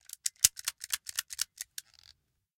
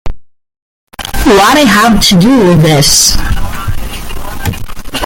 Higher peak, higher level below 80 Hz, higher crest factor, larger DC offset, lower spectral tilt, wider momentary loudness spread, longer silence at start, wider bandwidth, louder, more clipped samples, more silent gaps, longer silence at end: about the same, -2 dBFS vs 0 dBFS; second, -68 dBFS vs -20 dBFS; first, 34 dB vs 8 dB; neither; second, 3.5 dB/octave vs -4 dB/octave; about the same, 17 LU vs 17 LU; first, 0.25 s vs 0.05 s; second, 17 kHz vs over 20 kHz; second, -31 LUFS vs -7 LUFS; second, under 0.1% vs 0.2%; second, none vs 0.62-0.87 s; first, 0.95 s vs 0 s